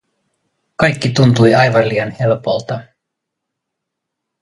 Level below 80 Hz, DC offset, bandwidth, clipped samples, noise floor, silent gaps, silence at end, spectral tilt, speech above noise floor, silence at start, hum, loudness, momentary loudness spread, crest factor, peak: -48 dBFS; under 0.1%; 11.5 kHz; under 0.1%; -78 dBFS; none; 1.6 s; -6.5 dB/octave; 65 dB; 0.8 s; none; -13 LUFS; 14 LU; 16 dB; 0 dBFS